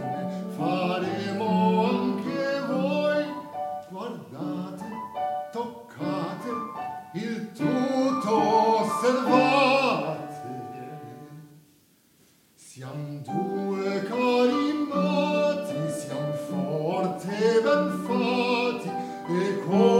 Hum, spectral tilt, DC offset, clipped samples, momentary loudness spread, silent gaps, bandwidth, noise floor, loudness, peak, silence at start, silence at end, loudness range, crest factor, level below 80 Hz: none; -6 dB/octave; under 0.1%; under 0.1%; 15 LU; none; 16 kHz; -61 dBFS; -26 LUFS; -6 dBFS; 0 s; 0 s; 10 LU; 20 dB; -74 dBFS